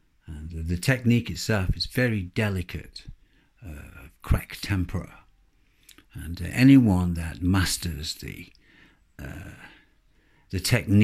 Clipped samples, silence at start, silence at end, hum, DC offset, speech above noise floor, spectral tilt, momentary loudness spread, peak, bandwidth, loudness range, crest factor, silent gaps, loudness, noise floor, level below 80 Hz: under 0.1%; 0.3 s; 0 s; none; under 0.1%; 38 dB; -5.5 dB/octave; 23 LU; -4 dBFS; 15.5 kHz; 10 LU; 22 dB; none; -25 LUFS; -62 dBFS; -40 dBFS